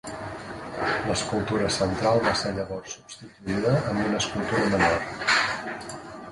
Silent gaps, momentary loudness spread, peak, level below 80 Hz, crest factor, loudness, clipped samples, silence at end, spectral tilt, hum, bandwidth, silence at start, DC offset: none; 15 LU; -8 dBFS; -48 dBFS; 18 dB; -25 LUFS; under 0.1%; 0 s; -4.5 dB/octave; none; 11.5 kHz; 0.05 s; under 0.1%